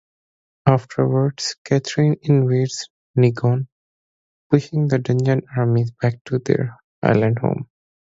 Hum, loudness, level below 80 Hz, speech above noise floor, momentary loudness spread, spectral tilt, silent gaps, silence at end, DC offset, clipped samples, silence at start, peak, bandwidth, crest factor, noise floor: none; -20 LUFS; -56 dBFS; over 72 dB; 8 LU; -7 dB/octave; 1.58-1.65 s, 2.90-3.14 s, 3.72-4.50 s, 6.21-6.25 s, 6.84-7.02 s; 0.55 s; under 0.1%; under 0.1%; 0.65 s; 0 dBFS; 7.8 kHz; 20 dB; under -90 dBFS